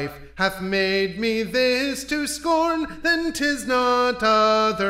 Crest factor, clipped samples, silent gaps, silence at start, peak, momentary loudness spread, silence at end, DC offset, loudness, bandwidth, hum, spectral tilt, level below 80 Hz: 16 dB; under 0.1%; none; 0 s; -6 dBFS; 6 LU; 0 s; under 0.1%; -21 LUFS; 16 kHz; none; -3.5 dB/octave; -48 dBFS